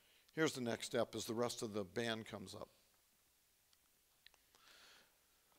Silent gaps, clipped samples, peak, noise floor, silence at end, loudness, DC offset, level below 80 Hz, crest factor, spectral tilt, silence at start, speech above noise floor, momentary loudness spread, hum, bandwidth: none; under 0.1%; -22 dBFS; -76 dBFS; 0.6 s; -43 LUFS; under 0.1%; -80 dBFS; 24 dB; -4 dB/octave; 0.35 s; 34 dB; 23 LU; none; 16 kHz